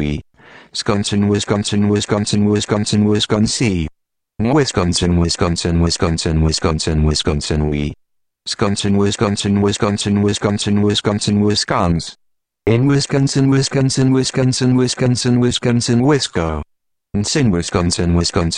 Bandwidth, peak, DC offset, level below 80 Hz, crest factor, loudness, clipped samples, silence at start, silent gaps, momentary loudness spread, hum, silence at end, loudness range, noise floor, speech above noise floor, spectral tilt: 10.5 kHz; -4 dBFS; under 0.1%; -32 dBFS; 12 dB; -16 LUFS; under 0.1%; 0 s; none; 7 LU; none; 0 s; 3 LU; -55 dBFS; 40 dB; -5 dB/octave